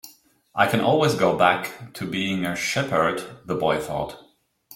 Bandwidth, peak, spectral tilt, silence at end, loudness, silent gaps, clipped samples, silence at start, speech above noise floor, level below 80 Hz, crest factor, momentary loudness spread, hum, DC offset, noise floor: 17 kHz; -2 dBFS; -5 dB/octave; 0 s; -23 LUFS; none; under 0.1%; 0.05 s; 30 dB; -56 dBFS; 20 dB; 13 LU; none; under 0.1%; -52 dBFS